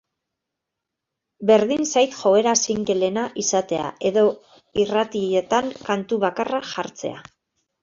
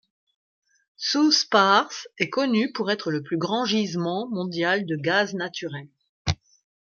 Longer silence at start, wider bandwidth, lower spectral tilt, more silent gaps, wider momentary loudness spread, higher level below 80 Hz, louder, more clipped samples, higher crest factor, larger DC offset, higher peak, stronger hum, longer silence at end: first, 1.4 s vs 1 s; about the same, 7.6 kHz vs 7.2 kHz; about the same, -3.5 dB/octave vs -4 dB/octave; second, none vs 6.09-6.25 s; about the same, 12 LU vs 13 LU; second, -60 dBFS vs -54 dBFS; first, -21 LUFS vs -24 LUFS; neither; about the same, 18 dB vs 22 dB; neither; about the same, -4 dBFS vs -4 dBFS; neither; about the same, 0.6 s vs 0.6 s